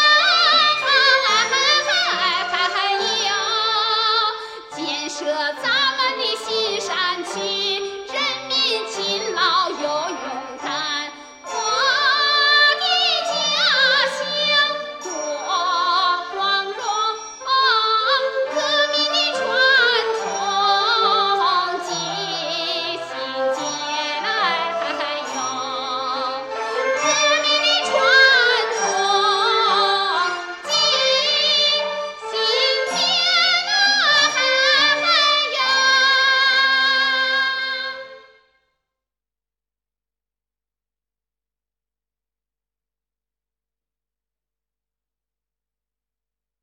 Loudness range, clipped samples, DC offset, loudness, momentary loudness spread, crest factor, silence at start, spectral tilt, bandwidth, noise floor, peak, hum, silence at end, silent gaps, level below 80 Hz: 7 LU; under 0.1%; under 0.1%; -17 LUFS; 11 LU; 18 dB; 0 s; 0 dB/octave; 15 kHz; -89 dBFS; -2 dBFS; 50 Hz at -70 dBFS; 8.45 s; none; -68 dBFS